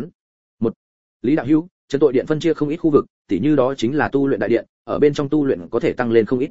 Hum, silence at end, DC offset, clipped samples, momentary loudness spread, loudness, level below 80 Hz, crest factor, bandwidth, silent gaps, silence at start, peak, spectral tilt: none; 0 s; 1%; under 0.1%; 8 LU; -19 LUFS; -52 dBFS; 16 dB; 7.8 kHz; 0.15-0.58 s, 0.76-1.20 s, 1.71-1.88 s, 3.10-3.25 s, 4.69-4.85 s; 0 s; -2 dBFS; -7.5 dB/octave